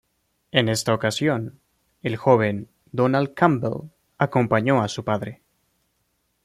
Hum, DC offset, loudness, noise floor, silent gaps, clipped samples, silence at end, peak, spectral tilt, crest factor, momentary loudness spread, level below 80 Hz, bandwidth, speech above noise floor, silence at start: none; under 0.1%; -22 LUFS; -71 dBFS; none; under 0.1%; 1.1 s; -2 dBFS; -5.5 dB/octave; 20 dB; 13 LU; -60 dBFS; 15 kHz; 50 dB; 0.55 s